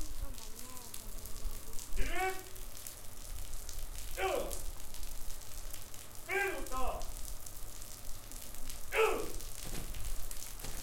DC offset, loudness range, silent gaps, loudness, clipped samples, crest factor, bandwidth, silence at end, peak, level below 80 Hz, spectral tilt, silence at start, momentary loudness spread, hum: under 0.1%; 4 LU; none; -41 LUFS; under 0.1%; 18 dB; 17 kHz; 0 s; -16 dBFS; -42 dBFS; -3 dB/octave; 0 s; 12 LU; none